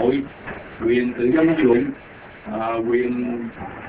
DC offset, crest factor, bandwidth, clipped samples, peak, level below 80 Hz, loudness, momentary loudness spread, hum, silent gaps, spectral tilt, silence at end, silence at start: under 0.1%; 16 dB; 4 kHz; under 0.1%; -4 dBFS; -50 dBFS; -21 LUFS; 17 LU; none; none; -11 dB/octave; 0 s; 0 s